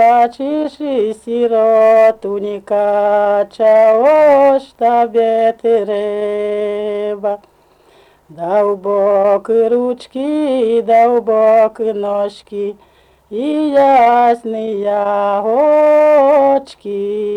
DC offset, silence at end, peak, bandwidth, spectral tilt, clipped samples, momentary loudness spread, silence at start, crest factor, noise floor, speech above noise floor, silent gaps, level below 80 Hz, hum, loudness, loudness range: under 0.1%; 0 s; -4 dBFS; 10 kHz; -6.5 dB/octave; under 0.1%; 11 LU; 0 s; 8 dB; -50 dBFS; 37 dB; none; -58 dBFS; none; -13 LUFS; 5 LU